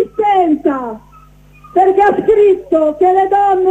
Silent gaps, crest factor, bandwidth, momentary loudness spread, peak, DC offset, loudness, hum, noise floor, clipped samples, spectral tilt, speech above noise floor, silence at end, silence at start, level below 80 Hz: none; 10 dB; 8 kHz; 9 LU; -2 dBFS; under 0.1%; -12 LUFS; none; -42 dBFS; under 0.1%; -7 dB/octave; 31 dB; 0 s; 0 s; -46 dBFS